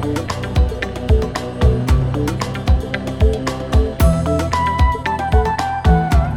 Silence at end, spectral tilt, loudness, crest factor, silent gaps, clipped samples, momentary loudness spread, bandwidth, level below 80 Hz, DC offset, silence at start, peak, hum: 0 s; -6.5 dB/octave; -18 LUFS; 14 dB; none; under 0.1%; 6 LU; 16.5 kHz; -20 dBFS; under 0.1%; 0 s; -2 dBFS; none